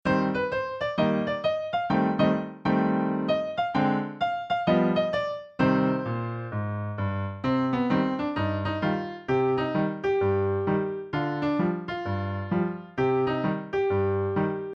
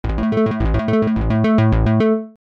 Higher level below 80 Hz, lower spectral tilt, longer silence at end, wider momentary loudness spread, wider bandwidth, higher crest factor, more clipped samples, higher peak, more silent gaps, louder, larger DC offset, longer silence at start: second, -56 dBFS vs -24 dBFS; about the same, -8.5 dB/octave vs -9.5 dB/octave; second, 0 s vs 0.15 s; about the same, 6 LU vs 4 LU; first, 7.2 kHz vs 6 kHz; first, 16 dB vs 10 dB; neither; about the same, -10 dBFS vs -8 dBFS; neither; second, -27 LUFS vs -17 LUFS; neither; about the same, 0.05 s vs 0.05 s